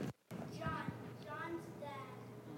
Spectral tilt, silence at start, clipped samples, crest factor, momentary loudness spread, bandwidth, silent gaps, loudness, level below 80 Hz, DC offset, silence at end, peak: -6.5 dB/octave; 0 s; under 0.1%; 18 dB; 8 LU; 16.5 kHz; none; -47 LUFS; -68 dBFS; under 0.1%; 0 s; -28 dBFS